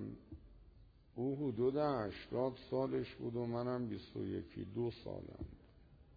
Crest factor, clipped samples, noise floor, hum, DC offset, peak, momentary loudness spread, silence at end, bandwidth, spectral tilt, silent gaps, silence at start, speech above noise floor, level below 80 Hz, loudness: 16 dB; under 0.1%; -63 dBFS; none; under 0.1%; -24 dBFS; 16 LU; 0 s; 5 kHz; -7 dB/octave; none; 0 s; 23 dB; -62 dBFS; -41 LUFS